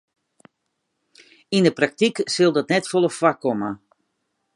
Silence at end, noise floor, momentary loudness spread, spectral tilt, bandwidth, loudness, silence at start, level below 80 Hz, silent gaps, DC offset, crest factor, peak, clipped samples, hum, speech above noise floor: 0.8 s; -76 dBFS; 8 LU; -5 dB/octave; 11.5 kHz; -20 LUFS; 1.5 s; -70 dBFS; none; under 0.1%; 22 dB; -2 dBFS; under 0.1%; none; 56 dB